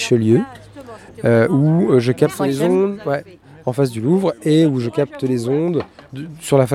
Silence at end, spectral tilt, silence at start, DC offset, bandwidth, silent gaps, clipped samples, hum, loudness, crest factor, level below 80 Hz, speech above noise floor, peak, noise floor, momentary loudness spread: 0 s; -7 dB/octave; 0 s; under 0.1%; 15.5 kHz; none; under 0.1%; none; -17 LUFS; 16 dB; -56 dBFS; 21 dB; 0 dBFS; -37 dBFS; 17 LU